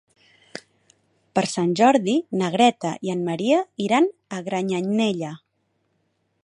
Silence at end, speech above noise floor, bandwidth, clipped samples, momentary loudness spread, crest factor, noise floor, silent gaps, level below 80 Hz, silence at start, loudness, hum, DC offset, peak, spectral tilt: 1.05 s; 50 dB; 11 kHz; under 0.1%; 15 LU; 20 dB; -71 dBFS; none; -70 dBFS; 1.35 s; -22 LUFS; none; under 0.1%; -2 dBFS; -5.5 dB/octave